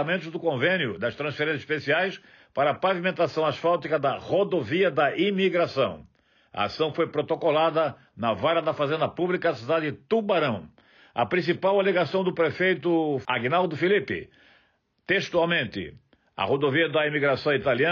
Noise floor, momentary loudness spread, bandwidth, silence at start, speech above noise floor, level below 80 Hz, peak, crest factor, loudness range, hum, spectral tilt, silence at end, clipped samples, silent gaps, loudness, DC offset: -66 dBFS; 7 LU; 7.2 kHz; 0 s; 42 dB; -66 dBFS; -12 dBFS; 14 dB; 2 LU; none; -3.5 dB/octave; 0 s; under 0.1%; none; -25 LUFS; under 0.1%